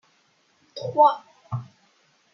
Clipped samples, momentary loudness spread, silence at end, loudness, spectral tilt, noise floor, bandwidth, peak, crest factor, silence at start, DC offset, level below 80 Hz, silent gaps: under 0.1%; 17 LU; 0.7 s; -23 LUFS; -7 dB/octave; -64 dBFS; 6.8 kHz; -4 dBFS; 22 dB; 0.75 s; under 0.1%; -74 dBFS; none